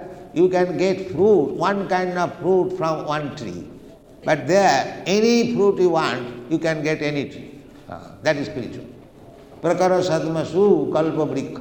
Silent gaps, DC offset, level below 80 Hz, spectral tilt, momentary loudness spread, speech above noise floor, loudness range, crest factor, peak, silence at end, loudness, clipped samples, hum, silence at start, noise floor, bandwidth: none; under 0.1%; -56 dBFS; -5.5 dB/octave; 16 LU; 24 dB; 6 LU; 18 dB; -4 dBFS; 0 s; -20 LUFS; under 0.1%; none; 0 s; -44 dBFS; 19 kHz